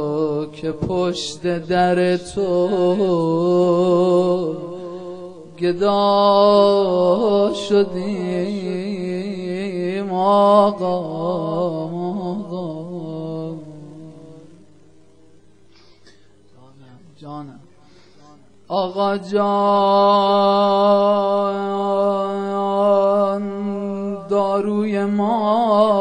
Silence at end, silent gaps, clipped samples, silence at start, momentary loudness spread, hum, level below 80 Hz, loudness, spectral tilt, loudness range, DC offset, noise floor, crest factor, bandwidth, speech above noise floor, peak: 0 s; none; under 0.1%; 0 s; 14 LU; none; -56 dBFS; -18 LUFS; -7 dB/octave; 12 LU; 0.4%; -52 dBFS; 16 dB; 10 kHz; 35 dB; -2 dBFS